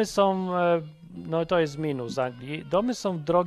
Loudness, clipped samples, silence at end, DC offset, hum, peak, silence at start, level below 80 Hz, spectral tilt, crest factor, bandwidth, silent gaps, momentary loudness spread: -27 LUFS; under 0.1%; 0 s; under 0.1%; none; -8 dBFS; 0 s; -58 dBFS; -6 dB/octave; 18 dB; 13 kHz; none; 7 LU